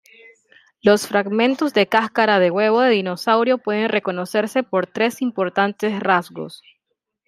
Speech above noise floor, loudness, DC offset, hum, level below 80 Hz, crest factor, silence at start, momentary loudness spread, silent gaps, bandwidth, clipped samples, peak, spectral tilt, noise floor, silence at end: 58 dB; -19 LUFS; under 0.1%; none; -68 dBFS; 18 dB; 0.85 s; 6 LU; none; 15 kHz; under 0.1%; -2 dBFS; -5 dB/octave; -76 dBFS; 0.7 s